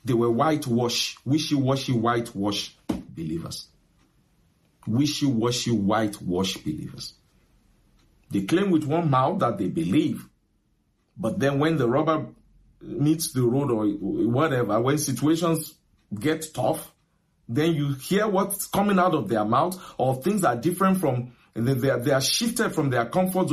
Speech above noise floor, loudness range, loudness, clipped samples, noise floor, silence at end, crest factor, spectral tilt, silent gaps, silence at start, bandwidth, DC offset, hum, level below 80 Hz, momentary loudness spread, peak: 44 dB; 4 LU; -24 LUFS; under 0.1%; -68 dBFS; 0 s; 16 dB; -5.5 dB/octave; none; 0.05 s; 15 kHz; under 0.1%; none; -56 dBFS; 10 LU; -8 dBFS